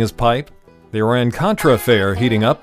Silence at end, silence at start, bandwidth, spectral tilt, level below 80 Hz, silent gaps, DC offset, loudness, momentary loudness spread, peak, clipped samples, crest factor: 0.05 s; 0 s; 15.5 kHz; -6 dB/octave; -38 dBFS; none; under 0.1%; -16 LUFS; 6 LU; -2 dBFS; under 0.1%; 14 dB